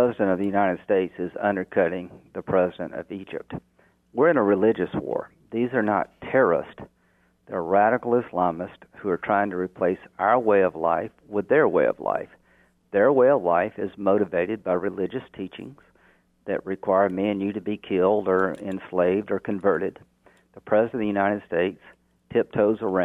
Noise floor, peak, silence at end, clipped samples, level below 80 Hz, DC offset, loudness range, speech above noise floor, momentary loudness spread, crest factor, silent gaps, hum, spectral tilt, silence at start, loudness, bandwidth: -64 dBFS; -6 dBFS; 0 s; under 0.1%; -62 dBFS; under 0.1%; 4 LU; 41 dB; 14 LU; 18 dB; none; none; -9 dB/octave; 0 s; -24 LUFS; 3.9 kHz